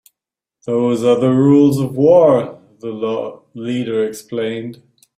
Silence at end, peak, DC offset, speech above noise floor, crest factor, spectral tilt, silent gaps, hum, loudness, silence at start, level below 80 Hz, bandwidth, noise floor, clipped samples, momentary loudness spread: 0.45 s; -2 dBFS; under 0.1%; 71 dB; 14 dB; -7.5 dB/octave; none; none; -15 LUFS; 0.65 s; -58 dBFS; 15 kHz; -86 dBFS; under 0.1%; 18 LU